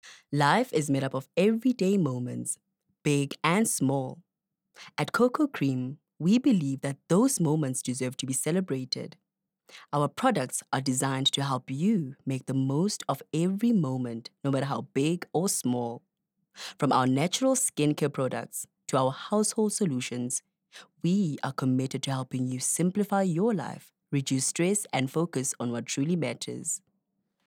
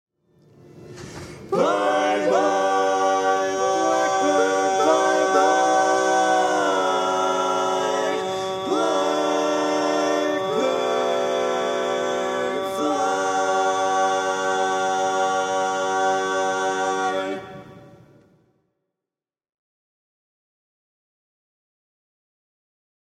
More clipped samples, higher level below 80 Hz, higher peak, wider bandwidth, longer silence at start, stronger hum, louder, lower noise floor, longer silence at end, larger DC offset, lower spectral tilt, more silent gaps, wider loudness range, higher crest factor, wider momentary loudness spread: neither; second, -78 dBFS vs -66 dBFS; second, -8 dBFS vs -4 dBFS; first, 18.5 kHz vs 14 kHz; second, 0.05 s vs 0.75 s; neither; second, -28 LUFS vs -21 LUFS; second, -78 dBFS vs -90 dBFS; second, 0.7 s vs 5.2 s; neither; first, -5 dB/octave vs -3 dB/octave; neither; second, 3 LU vs 6 LU; about the same, 22 dB vs 18 dB; first, 9 LU vs 6 LU